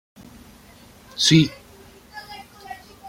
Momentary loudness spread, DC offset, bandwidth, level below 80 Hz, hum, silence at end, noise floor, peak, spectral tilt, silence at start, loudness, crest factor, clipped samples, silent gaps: 25 LU; under 0.1%; 16 kHz; -54 dBFS; none; 0 s; -48 dBFS; -2 dBFS; -4 dB/octave; 1.15 s; -18 LUFS; 22 dB; under 0.1%; none